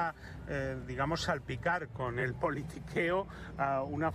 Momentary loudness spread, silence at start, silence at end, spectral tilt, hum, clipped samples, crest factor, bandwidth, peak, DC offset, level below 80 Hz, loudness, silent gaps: 6 LU; 0 s; 0 s; -6 dB/octave; none; under 0.1%; 14 dB; 14 kHz; -20 dBFS; under 0.1%; -52 dBFS; -35 LUFS; none